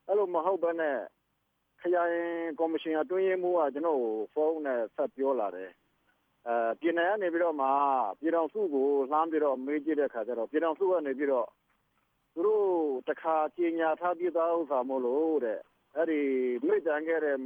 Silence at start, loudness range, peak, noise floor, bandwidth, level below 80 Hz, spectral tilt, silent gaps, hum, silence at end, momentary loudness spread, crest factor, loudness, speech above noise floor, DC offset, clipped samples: 0.1 s; 3 LU; -14 dBFS; -78 dBFS; 4.4 kHz; -84 dBFS; -7.5 dB/octave; none; none; 0 s; 6 LU; 16 dB; -30 LUFS; 48 dB; under 0.1%; under 0.1%